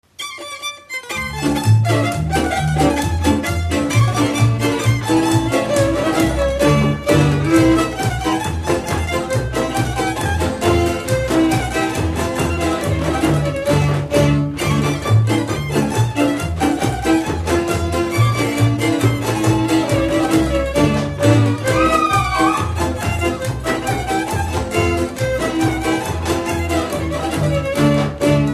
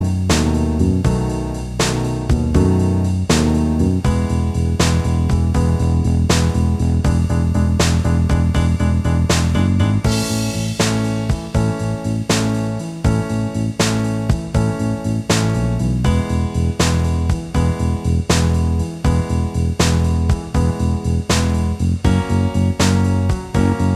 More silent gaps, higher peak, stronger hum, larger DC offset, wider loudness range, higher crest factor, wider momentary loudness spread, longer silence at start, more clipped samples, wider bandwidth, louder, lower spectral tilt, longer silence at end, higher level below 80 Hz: neither; about the same, 0 dBFS vs 0 dBFS; neither; neither; about the same, 3 LU vs 3 LU; about the same, 16 dB vs 16 dB; about the same, 5 LU vs 4 LU; first, 0.2 s vs 0 s; neither; about the same, 15 kHz vs 14 kHz; about the same, -17 LUFS vs -18 LUFS; about the same, -6 dB/octave vs -6 dB/octave; about the same, 0 s vs 0 s; second, -30 dBFS vs -24 dBFS